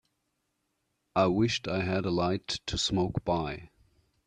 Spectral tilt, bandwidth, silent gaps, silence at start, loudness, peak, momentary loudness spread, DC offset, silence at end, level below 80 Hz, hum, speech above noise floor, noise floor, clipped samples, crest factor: -5 dB/octave; 10.5 kHz; none; 1.15 s; -29 LUFS; -12 dBFS; 7 LU; under 0.1%; 0.6 s; -52 dBFS; none; 50 dB; -79 dBFS; under 0.1%; 20 dB